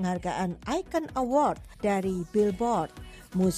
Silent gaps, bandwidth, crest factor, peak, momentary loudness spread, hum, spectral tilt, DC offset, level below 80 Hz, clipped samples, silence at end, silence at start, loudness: none; 14 kHz; 16 dB; -12 dBFS; 7 LU; none; -6.5 dB/octave; under 0.1%; -50 dBFS; under 0.1%; 0 s; 0 s; -29 LUFS